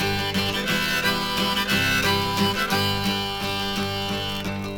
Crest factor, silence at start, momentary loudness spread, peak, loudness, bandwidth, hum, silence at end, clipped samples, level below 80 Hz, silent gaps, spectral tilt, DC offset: 16 dB; 0 s; 6 LU; -8 dBFS; -22 LUFS; 19.5 kHz; none; 0 s; under 0.1%; -44 dBFS; none; -3.5 dB/octave; under 0.1%